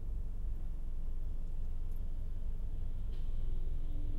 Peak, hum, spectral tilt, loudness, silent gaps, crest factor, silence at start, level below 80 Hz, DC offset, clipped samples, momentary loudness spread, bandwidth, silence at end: -26 dBFS; none; -8.5 dB/octave; -45 LUFS; none; 8 dB; 0 s; -36 dBFS; under 0.1%; under 0.1%; 2 LU; 1.4 kHz; 0 s